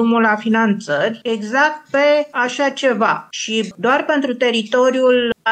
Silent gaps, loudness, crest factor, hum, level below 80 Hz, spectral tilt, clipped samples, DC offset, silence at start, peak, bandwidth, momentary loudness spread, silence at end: none; -16 LUFS; 14 dB; none; -66 dBFS; -4 dB/octave; under 0.1%; under 0.1%; 0 s; -4 dBFS; 9 kHz; 5 LU; 0 s